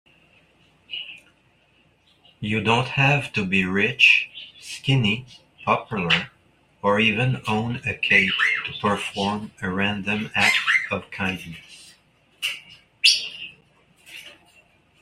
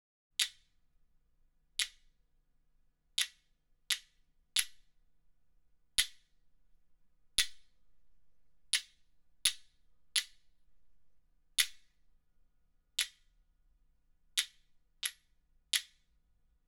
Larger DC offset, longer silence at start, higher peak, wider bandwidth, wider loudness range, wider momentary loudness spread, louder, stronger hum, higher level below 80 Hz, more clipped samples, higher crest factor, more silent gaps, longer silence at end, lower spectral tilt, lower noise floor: neither; first, 0.9 s vs 0.4 s; first, -2 dBFS vs -10 dBFS; second, 15 kHz vs over 20 kHz; about the same, 5 LU vs 4 LU; first, 19 LU vs 7 LU; first, -21 LUFS vs -36 LUFS; neither; first, -58 dBFS vs -66 dBFS; neither; second, 22 dB vs 32 dB; neither; second, 0.7 s vs 0.85 s; first, -4 dB/octave vs 4 dB/octave; second, -61 dBFS vs -72 dBFS